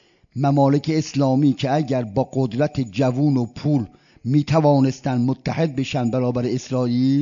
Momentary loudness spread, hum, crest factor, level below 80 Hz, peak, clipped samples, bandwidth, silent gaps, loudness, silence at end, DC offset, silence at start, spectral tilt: 6 LU; none; 14 dB; -54 dBFS; -4 dBFS; under 0.1%; 7.4 kHz; none; -20 LUFS; 0 s; under 0.1%; 0.35 s; -7.5 dB/octave